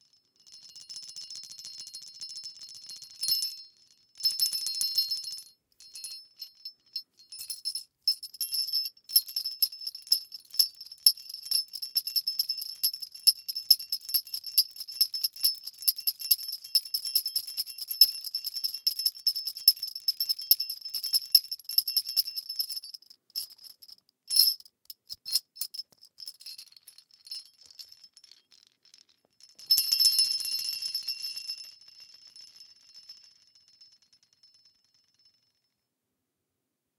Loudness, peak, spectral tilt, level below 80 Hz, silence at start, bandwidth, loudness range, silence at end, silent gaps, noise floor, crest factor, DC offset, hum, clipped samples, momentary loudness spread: -27 LUFS; -4 dBFS; 4.5 dB/octave; -86 dBFS; 0.5 s; 19 kHz; 12 LU; 3.15 s; none; -84 dBFS; 28 dB; under 0.1%; none; under 0.1%; 21 LU